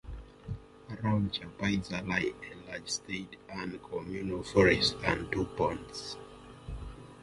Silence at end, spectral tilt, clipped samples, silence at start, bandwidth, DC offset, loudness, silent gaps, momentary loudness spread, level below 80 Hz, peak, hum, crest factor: 0 s; -4.5 dB/octave; under 0.1%; 0.05 s; 11.5 kHz; under 0.1%; -32 LUFS; none; 19 LU; -50 dBFS; -10 dBFS; none; 24 dB